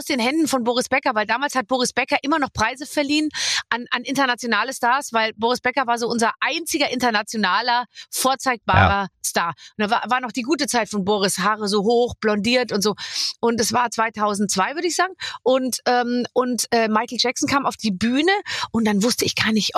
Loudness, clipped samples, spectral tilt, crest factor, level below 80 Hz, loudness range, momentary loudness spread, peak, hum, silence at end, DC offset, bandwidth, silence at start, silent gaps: -20 LUFS; under 0.1%; -3.5 dB/octave; 18 dB; -50 dBFS; 1 LU; 4 LU; -2 dBFS; none; 0 s; under 0.1%; 15 kHz; 0 s; none